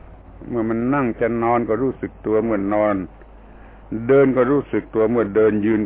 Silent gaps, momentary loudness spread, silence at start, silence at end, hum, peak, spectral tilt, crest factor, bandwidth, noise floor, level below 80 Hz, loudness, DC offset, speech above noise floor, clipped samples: none; 12 LU; 0.05 s; 0 s; none; -6 dBFS; -12 dB/octave; 14 dB; 3.8 kHz; -42 dBFS; -44 dBFS; -19 LUFS; under 0.1%; 24 dB; under 0.1%